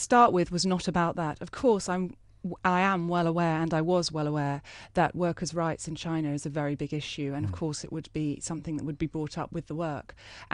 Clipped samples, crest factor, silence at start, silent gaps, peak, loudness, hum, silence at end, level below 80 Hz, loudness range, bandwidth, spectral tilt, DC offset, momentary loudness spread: under 0.1%; 20 dB; 0 s; none; -8 dBFS; -29 LUFS; none; 0.1 s; -54 dBFS; 6 LU; 11.5 kHz; -5.5 dB/octave; under 0.1%; 10 LU